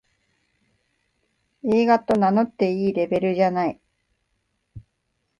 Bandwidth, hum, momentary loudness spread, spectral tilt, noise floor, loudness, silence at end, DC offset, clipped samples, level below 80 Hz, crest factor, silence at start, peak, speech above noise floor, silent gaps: 11 kHz; none; 6 LU; -8 dB/octave; -74 dBFS; -21 LUFS; 0.6 s; under 0.1%; under 0.1%; -60 dBFS; 18 dB; 1.65 s; -6 dBFS; 54 dB; none